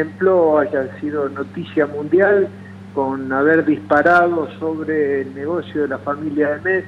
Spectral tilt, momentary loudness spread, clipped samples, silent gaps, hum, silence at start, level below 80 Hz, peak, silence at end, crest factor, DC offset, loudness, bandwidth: -8 dB/octave; 10 LU; under 0.1%; none; none; 0 s; -60 dBFS; -4 dBFS; 0 s; 14 dB; under 0.1%; -18 LUFS; 7.4 kHz